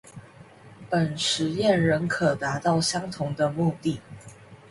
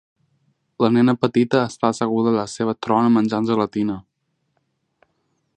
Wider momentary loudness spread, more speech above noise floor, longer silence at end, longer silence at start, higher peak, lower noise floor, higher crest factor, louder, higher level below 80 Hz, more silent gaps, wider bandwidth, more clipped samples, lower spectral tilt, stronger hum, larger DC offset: about the same, 9 LU vs 8 LU; second, 24 dB vs 54 dB; second, 0.15 s vs 1.55 s; second, 0.05 s vs 0.8 s; second, -10 dBFS vs 0 dBFS; second, -49 dBFS vs -72 dBFS; about the same, 16 dB vs 20 dB; second, -25 LUFS vs -19 LUFS; about the same, -58 dBFS vs -60 dBFS; neither; first, 11.5 kHz vs 9.6 kHz; neither; second, -5 dB/octave vs -6.5 dB/octave; neither; neither